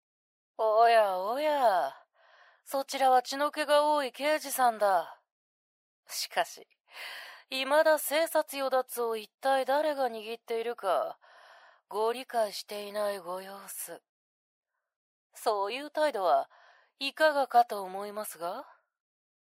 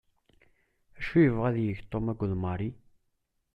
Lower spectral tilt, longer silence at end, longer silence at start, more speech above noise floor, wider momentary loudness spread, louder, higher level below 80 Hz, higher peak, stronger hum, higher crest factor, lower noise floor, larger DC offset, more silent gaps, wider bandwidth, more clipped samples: second, -1.5 dB/octave vs -10 dB/octave; about the same, 0.8 s vs 0.8 s; second, 0.6 s vs 0.95 s; second, 32 dB vs 49 dB; about the same, 14 LU vs 12 LU; about the same, -29 LUFS vs -29 LUFS; second, under -90 dBFS vs -52 dBFS; about the same, -12 dBFS vs -10 dBFS; neither; about the same, 18 dB vs 20 dB; second, -61 dBFS vs -77 dBFS; neither; first, 5.32-6.03 s, 14.09-14.63 s, 14.96-15.30 s vs none; first, 16 kHz vs 5.8 kHz; neither